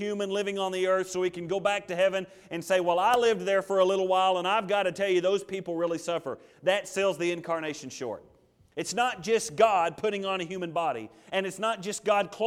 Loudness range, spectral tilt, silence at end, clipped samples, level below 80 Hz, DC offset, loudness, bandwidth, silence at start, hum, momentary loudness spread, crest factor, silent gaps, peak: 5 LU; -4 dB/octave; 0 s; under 0.1%; -70 dBFS; under 0.1%; -28 LUFS; 15.5 kHz; 0 s; none; 11 LU; 18 dB; none; -10 dBFS